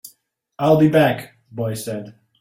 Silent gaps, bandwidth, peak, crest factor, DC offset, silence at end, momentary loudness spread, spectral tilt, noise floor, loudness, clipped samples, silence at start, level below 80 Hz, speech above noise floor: none; 16.5 kHz; -4 dBFS; 16 dB; under 0.1%; 0.3 s; 16 LU; -6.5 dB/octave; -60 dBFS; -19 LUFS; under 0.1%; 0.05 s; -56 dBFS; 43 dB